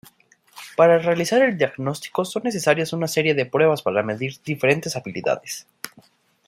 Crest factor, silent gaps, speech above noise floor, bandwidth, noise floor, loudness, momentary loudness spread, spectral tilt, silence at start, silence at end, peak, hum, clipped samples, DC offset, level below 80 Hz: 20 dB; none; 35 dB; 16 kHz; -55 dBFS; -21 LUFS; 14 LU; -5 dB/octave; 0.55 s; 0.6 s; -2 dBFS; none; under 0.1%; under 0.1%; -66 dBFS